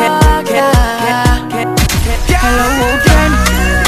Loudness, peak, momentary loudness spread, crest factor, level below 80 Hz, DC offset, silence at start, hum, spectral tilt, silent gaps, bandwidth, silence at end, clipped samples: -11 LUFS; 0 dBFS; 4 LU; 10 dB; -14 dBFS; under 0.1%; 0 s; none; -4.5 dB/octave; none; 15 kHz; 0 s; 0.2%